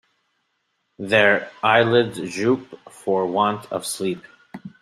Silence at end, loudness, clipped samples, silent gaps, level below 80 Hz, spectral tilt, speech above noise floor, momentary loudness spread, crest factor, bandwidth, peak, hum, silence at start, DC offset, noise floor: 0.1 s; -20 LUFS; under 0.1%; none; -64 dBFS; -4.5 dB/octave; 52 dB; 17 LU; 20 dB; 15.5 kHz; -2 dBFS; none; 1 s; under 0.1%; -72 dBFS